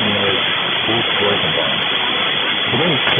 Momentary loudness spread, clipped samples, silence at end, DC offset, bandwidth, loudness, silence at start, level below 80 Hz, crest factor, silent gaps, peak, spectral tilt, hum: 1 LU; under 0.1%; 0 s; under 0.1%; 5 kHz; -15 LUFS; 0 s; -52 dBFS; 14 dB; none; -2 dBFS; -7 dB/octave; none